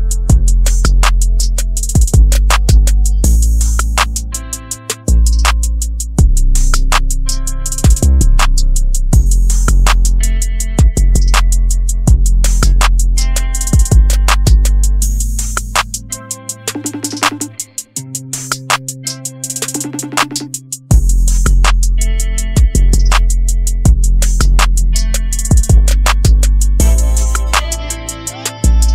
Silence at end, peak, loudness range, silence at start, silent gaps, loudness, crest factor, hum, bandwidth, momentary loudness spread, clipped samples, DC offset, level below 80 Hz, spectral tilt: 0 s; 0 dBFS; 6 LU; 0 s; none; -14 LUFS; 10 dB; none; 15.5 kHz; 9 LU; under 0.1%; under 0.1%; -10 dBFS; -4 dB/octave